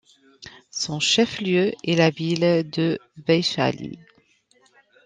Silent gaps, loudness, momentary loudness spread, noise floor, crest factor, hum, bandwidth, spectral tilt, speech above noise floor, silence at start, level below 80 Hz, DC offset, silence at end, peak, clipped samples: none; -22 LUFS; 9 LU; -61 dBFS; 20 dB; none; 9.6 kHz; -4.5 dB/octave; 39 dB; 0.4 s; -64 dBFS; under 0.1%; 1.1 s; -4 dBFS; under 0.1%